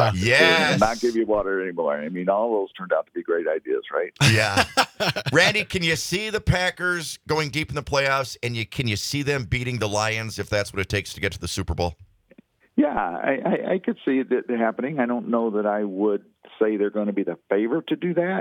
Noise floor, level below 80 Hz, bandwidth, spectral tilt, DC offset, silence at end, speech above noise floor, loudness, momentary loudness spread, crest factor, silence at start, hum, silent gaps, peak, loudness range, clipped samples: -55 dBFS; -46 dBFS; 19.5 kHz; -4.5 dB/octave; under 0.1%; 0 s; 32 dB; -23 LUFS; 9 LU; 20 dB; 0 s; none; none; -2 dBFS; 5 LU; under 0.1%